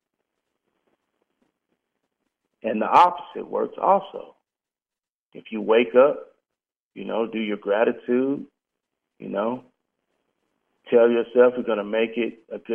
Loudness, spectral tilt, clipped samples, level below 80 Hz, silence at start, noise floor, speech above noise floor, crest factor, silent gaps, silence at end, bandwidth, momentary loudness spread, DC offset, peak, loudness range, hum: -22 LUFS; -7 dB/octave; under 0.1%; -74 dBFS; 2.65 s; under -90 dBFS; over 69 dB; 22 dB; 5.09-5.30 s, 6.76-6.91 s; 0 s; 6.8 kHz; 17 LU; under 0.1%; -2 dBFS; 4 LU; none